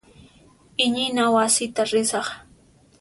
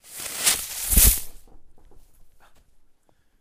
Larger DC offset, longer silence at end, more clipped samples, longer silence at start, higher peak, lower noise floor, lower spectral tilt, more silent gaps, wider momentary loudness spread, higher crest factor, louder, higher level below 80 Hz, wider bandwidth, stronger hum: neither; second, 0.6 s vs 1.1 s; neither; first, 0.8 s vs 0.1 s; second, -6 dBFS vs -2 dBFS; second, -55 dBFS vs -59 dBFS; about the same, -2 dB/octave vs -1.5 dB/octave; neither; about the same, 13 LU vs 15 LU; second, 18 dB vs 24 dB; about the same, -21 LUFS vs -19 LUFS; second, -60 dBFS vs -30 dBFS; second, 11.5 kHz vs 16 kHz; neither